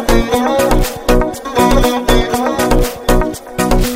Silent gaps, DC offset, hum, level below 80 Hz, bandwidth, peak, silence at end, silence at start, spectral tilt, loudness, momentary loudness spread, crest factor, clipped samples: none; under 0.1%; none; -18 dBFS; 16.5 kHz; 0 dBFS; 0 s; 0 s; -5 dB/octave; -14 LUFS; 4 LU; 12 dB; under 0.1%